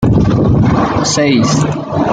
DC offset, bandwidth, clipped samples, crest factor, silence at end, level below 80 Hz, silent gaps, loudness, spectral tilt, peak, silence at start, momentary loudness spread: under 0.1%; 9.4 kHz; under 0.1%; 10 dB; 0 s; -28 dBFS; none; -12 LUFS; -5.5 dB/octave; -2 dBFS; 0 s; 4 LU